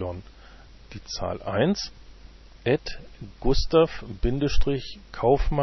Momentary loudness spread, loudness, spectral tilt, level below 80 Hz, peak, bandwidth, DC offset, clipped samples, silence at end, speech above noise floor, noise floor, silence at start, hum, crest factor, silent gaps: 18 LU; -26 LUFS; -6 dB/octave; -32 dBFS; -8 dBFS; 6.2 kHz; under 0.1%; under 0.1%; 0 s; 24 dB; -47 dBFS; 0 s; none; 18 dB; none